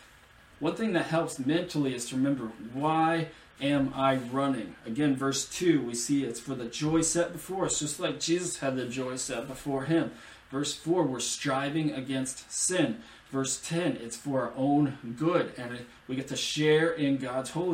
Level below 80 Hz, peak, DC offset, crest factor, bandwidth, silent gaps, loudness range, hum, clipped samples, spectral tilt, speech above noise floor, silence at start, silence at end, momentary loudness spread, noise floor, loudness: -62 dBFS; -12 dBFS; under 0.1%; 18 dB; 16 kHz; none; 2 LU; none; under 0.1%; -4.5 dB/octave; 27 dB; 0 s; 0 s; 9 LU; -56 dBFS; -30 LUFS